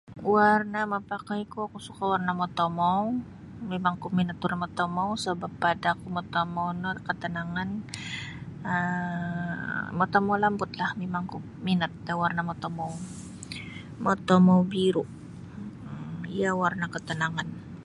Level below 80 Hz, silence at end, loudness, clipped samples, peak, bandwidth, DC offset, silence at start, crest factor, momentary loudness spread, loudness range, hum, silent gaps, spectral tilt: -58 dBFS; 0 s; -28 LUFS; under 0.1%; -6 dBFS; 11.5 kHz; under 0.1%; 0.05 s; 22 dB; 15 LU; 5 LU; none; none; -6.5 dB/octave